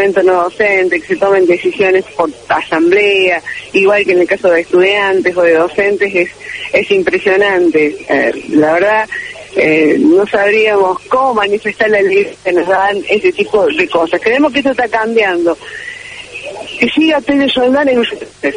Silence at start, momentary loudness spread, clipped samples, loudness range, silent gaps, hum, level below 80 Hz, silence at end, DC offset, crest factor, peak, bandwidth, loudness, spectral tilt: 0 s; 8 LU; under 0.1%; 3 LU; none; none; -48 dBFS; 0 s; under 0.1%; 12 dB; 0 dBFS; 10 kHz; -11 LUFS; -5 dB/octave